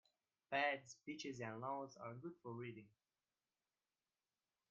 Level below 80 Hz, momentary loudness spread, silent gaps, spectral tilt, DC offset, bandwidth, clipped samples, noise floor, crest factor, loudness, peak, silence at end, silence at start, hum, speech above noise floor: under -90 dBFS; 13 LU; none; -3 dB/octave; under 0.1%; 7.4 kHz; under 0.1%; under -90 dBFS; 24 dB; -47 LUFS; -26 dBFS; 1.8 s; 0.5 s; none; over 39 dB